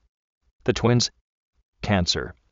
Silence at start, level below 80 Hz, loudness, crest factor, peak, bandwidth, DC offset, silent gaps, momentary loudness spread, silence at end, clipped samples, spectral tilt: 0.65 s; -44 dBFS; -23 LUFS; 20 dB; -6 dBFS; 8 kHz; under 0.1%; 1.21-1.53 s, 1.63-1.73 s; 8 LU; 0.2 s; under 0.1%; -4.5 dB/octave